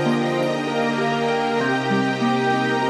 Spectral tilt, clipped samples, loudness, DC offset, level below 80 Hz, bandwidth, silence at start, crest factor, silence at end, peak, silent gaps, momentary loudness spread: -5.5 dB/octave; under 0.1%; -21 LUFS; under 0.1%; -64 dBFS; 12.5 kHz; 0 s; 12 dB; 0 s; -10 dBFS; none; 2 LU